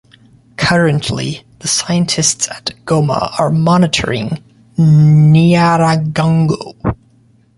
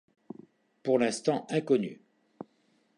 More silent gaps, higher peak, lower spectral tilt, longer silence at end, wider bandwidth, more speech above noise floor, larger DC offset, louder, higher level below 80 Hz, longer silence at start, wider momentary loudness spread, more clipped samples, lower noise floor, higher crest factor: neither; first, 0 dBFS vs -12 dBFS; about the same, -5 dB/octave vs -5.5 dB/octave; second, 0.6 s vs 1.05 s; about the same, 11.5 kHz vs 11.5 kHz; second, 38 dB vs 42 dB; neither; first, -13 LUFS vs -29 LUFS; first, -40 dBFS vs -78 dBFS; second, 0.6 s vs 0.85 s; second, 14 LU vs 22 LU; neither; second, -50 dBFS vs -70 dBFS; second, 12 dB vs 20 dB